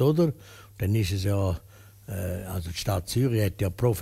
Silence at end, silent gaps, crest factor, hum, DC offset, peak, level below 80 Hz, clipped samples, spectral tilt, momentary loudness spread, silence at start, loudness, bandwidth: 0 s; none; 16 dB; none; under 0.1%; -10 dBFS; -46 dBFS; under 0.1%; -6.5 dB/octave; 12 LU; 0 s; -28 LUFS; 16 kHz